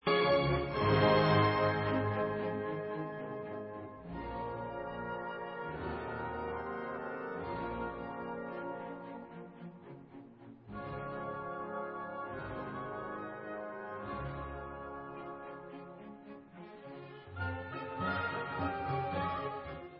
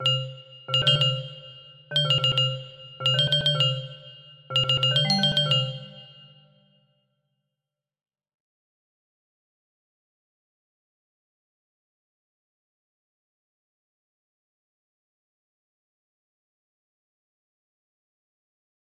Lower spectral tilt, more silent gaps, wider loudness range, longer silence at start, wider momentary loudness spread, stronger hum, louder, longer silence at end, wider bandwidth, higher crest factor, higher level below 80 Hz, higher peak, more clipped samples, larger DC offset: about the same, -4.5 dB/octave vs -4.5 dB/octave; neither; first, 13 LU vs 5 LU; about the same, 0.05 s vs 0 s; about the same, 20 LU vs 19 LU; neither; second, -37 LUFS vs -22 LUFS; second, 0 s vs 12.9 s; second, 5.6 kHz vs 13 kHz; about the same, 20 dB vs 22 dB; first, -56 dBFS vs -64 dBFS; second, -16 dBFS vs -8 dBFS; neither; neither